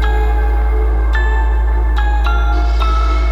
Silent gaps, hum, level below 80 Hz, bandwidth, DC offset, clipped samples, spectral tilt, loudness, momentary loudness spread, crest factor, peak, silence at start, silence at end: none; none; -12 dBFS; 6 kHz; under 0.1%; under 0.1%; -7 dB/octave; -16 LUFS; 1 LU; 8 dB; -4 dBFS; 0 s; 0 s